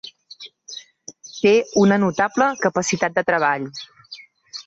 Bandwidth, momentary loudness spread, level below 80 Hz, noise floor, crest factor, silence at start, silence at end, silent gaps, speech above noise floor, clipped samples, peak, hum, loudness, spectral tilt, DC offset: 7.8 kHz; 23 LU; -60 dBFS; -43 dBFS; 16 dB; 0.05 s; 0.05 s; none; 25 dB; under 0.1%; -4 dBFS; none; -19 LUFS; -4.5 dB/octave; under 0.1%